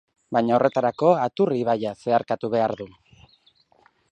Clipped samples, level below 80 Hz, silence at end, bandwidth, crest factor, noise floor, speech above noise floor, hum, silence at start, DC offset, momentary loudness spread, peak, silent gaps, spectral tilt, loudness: under 0.1%; -64 dBFS; 1.25 s; 9 kHz; 20 dB; -60 dBFS; 39 dB; none; 0.3 s; under 0.1%; 7 LU; -4 dBFS; none; -7.5 dB/octave; -22 LUFS